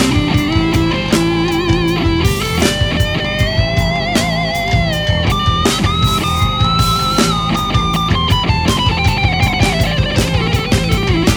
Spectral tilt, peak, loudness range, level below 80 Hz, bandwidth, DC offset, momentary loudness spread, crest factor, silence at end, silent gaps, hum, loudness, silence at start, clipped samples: -5 dB/octave; 0 dBFS; 1 LU; -24 dBFS; over 20 kHz; under 0.1%; 2 LU; 14 dB; 0 s; none; none; -14 LUFS; 0 s; under 0.1%